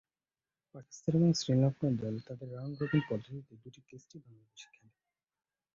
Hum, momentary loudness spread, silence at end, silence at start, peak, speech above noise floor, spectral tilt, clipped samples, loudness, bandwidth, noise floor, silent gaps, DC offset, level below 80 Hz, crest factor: none; 26 LU; 1.1 s; 0.75 s; -16 dBFS; over 56 dB; -6.5 dB/octave; under 0.1%; -33 LUFS; 7.6 kHz; under -90 dBFS; none; under 0.1%; -68 dBFS; 18 dB